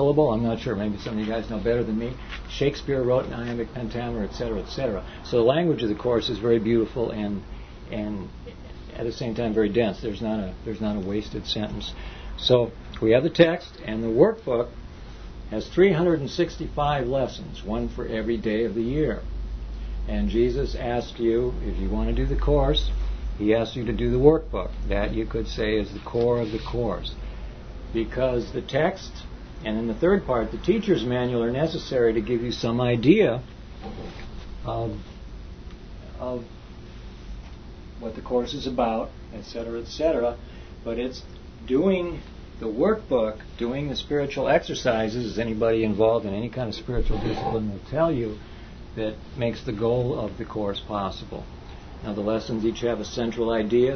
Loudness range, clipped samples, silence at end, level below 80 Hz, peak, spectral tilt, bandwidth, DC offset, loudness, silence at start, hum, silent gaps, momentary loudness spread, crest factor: 6 LU; under 0.1%; 0 s; -36 dBFS; -2 dBFS; -7 dB/octave; 6.6 kHz; under 0.1%; -25 LUFS; 0 s; none; none; 19 LU; 22 dB